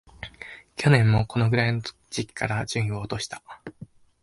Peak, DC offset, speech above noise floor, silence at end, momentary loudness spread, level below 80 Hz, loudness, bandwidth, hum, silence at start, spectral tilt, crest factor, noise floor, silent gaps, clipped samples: -6 dBFS; under 0.1%; 21 dB; 0.4 s; 22 LU; -48 dBFS; -24 LUFS; 11.5 kHz; none; 0.2 s; -6 dB/octave; 20 dB; -45 dBFS; none; under 0.1%